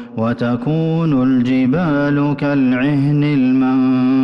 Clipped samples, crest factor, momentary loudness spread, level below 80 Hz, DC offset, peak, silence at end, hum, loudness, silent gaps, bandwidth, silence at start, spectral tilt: under 0.1%; 6 dB; 4 LU; -48 dBFS; under 0.1%; -8 dBFS; 0 s; none; -15 LUFS; none; 5.8 kHz; 0 s; -9.5 dB/octave